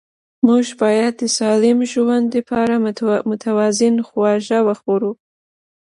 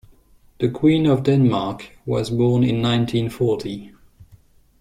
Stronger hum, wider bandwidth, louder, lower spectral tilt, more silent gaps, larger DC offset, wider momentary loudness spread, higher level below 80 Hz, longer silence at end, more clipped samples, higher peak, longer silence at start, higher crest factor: neither; second, 11.5 kHz vs 13.5 kHz; first, -17 LUFS vs -20 LUFS; second, -4.5 dB/octave vs -7.5 dB/octave; neither; neither; second, 5 LU vs 11 LU; second, -60 dBFS vs -48 dBFS; first, 0.8 s vs 0.55 s; neither; first, 0 dBFS vs -4 dBFS; second, 0.45 s vs 0.6 s; about the same, 16 dB vs 16 dB